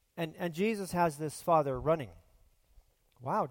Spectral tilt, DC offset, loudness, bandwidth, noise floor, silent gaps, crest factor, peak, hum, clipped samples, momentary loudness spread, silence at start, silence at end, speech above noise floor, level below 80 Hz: -6 dB/octave; under 0.1%; -32 LUFS; 17 kHz; -66 dBFS; none; 20 dB; -14 dBFS; none; under 0.1%; 10 LU; 0.15 s; 0 s; 34 dB; -58 dBFS